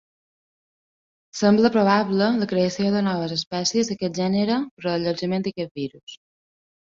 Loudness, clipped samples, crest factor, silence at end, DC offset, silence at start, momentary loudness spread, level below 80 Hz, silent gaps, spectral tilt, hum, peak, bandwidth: -22 LUFS; under 0.1%; 18 dB; 0.8 s; under 0.1%; 1.35 s; 13 LU; -62 dBFS; 3.47-3.51 s, 4.71-4.77 s, 5.71-5.75 s, 6.03-6.07 s; -5.5 dB/octave; none; -4 dBFS; 7.6 kHz